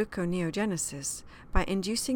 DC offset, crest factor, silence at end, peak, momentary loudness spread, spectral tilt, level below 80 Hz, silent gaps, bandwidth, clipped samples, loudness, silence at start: under 0.1%; 22 dB; 0 s; -8 dBFS; 5 LU; -4 dB/octave; -38 dBFS; none; 17.5 kHz; under 0.1%; -31 LUFS; 0 s